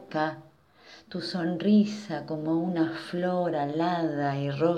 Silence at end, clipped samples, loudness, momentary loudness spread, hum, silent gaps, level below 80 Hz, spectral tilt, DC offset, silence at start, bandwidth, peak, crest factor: 0 s; under 0.1%; -28 LUFS; 11 LU; none; none; -72 dBFS; -7.5 dB/octave; under 0.1%; 0 s; 9.8 kHz; -10 dBFS; 18 dB